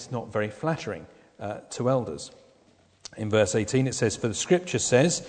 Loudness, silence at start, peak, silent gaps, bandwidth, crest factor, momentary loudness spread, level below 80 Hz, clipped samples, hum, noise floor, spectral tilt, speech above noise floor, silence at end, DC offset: -26 LUFS; 0 s; -8 dBFS; none; 9.4 kHz; 20 dB; 16 LU; -60 dBFS; under 0.1%; none; -60 dBFS; -4.5 dB/octave; 34 dB; 0 s; under 0.1%